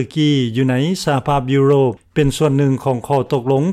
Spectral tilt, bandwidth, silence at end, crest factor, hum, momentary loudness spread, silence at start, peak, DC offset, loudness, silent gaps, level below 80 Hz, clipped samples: -6.5 dB/octave; 13.5 kHz; 0 s; 10 dB; none; 4 LU; 0 s; -4 dBFS; under 0.1%; -16 LUFS; none; -42 dBFS; under 0.1%